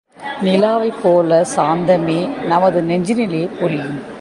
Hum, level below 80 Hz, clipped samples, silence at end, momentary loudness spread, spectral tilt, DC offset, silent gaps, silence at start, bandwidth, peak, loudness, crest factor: none; -56 dBFS; under 0.1%; 0 s; 6 LU; -6 dB/octave; under 0.1%; none; 0.2 s; 11.5 kHz; -2 dBFS; -16 LUFS; 14 dB